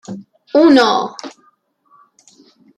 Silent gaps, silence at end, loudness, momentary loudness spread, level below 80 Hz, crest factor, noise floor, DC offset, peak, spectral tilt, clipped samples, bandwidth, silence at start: none; 1.5 s; -13 LUFS; 24 LU; -64 dBFS; 16 dB; -57 dBFS; under 0.1%; -2 dBFS; -4.5 dB/octave; under 0.1%; 10 kHz; 0.1 s